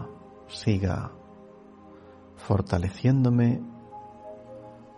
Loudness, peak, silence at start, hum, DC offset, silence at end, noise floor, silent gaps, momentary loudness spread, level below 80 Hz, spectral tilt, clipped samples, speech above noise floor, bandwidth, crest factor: -26 LUFS; -10 dBFS; 0 s; none; under 0.1%; 0.2 s; -49 dBFS; none; 23 LU; -52 dBFS; -8 dB/octave; under 0.1%; 25 dB; 10 kHz; 20 dB